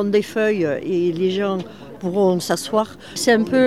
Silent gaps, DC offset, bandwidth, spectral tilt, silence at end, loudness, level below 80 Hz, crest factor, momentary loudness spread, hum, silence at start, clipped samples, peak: none; 0.3%; 15.5 kHz; -5 dB/octave; 0 s; -20 LUFS; -58 dBFS; 18 dB; 9 LU; none; 0 s; under 0.1%; -2 dBFS